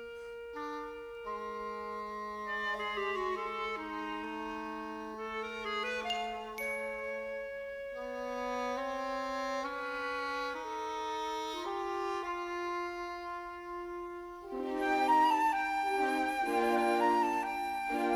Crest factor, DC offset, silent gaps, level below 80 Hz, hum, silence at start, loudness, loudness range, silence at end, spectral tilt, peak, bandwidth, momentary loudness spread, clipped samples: 18 dB; under 0.1%; none; -64 dBFS; none; 0 s; -35 LUFS; 8 LU; 0 s; -3 dB/octave; -18 dBFS; 20 kHz; 12 LU; under 0.1%